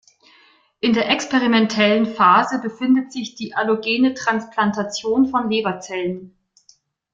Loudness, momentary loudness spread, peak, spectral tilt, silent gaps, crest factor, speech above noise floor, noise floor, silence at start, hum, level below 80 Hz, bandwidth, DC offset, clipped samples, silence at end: -19 LUFS; 10 LU; -2 dBFS; -4.5 dB/octave; none; 18 dB; 38 dB; -57 dBFS; 0.85 s; none; -62 dBFS; 7.6 kHz; under 0.1%; under 0.1%; 0.85 s